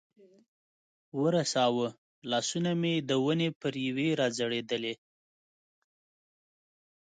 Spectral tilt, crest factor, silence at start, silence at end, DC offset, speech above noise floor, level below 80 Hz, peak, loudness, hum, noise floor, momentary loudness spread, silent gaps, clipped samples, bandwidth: -4.5 dB/octave; 16 dB; 1.15 s; 2.15 s; under 0.1%; over 60 dB; -76 dBFS; -16 dBFS; -30 LUFS; none; under -90 dBFS; 9 LU; 1.98-2.22 s, 3.55-3.60 s; under 0.1%; 9.4 kHz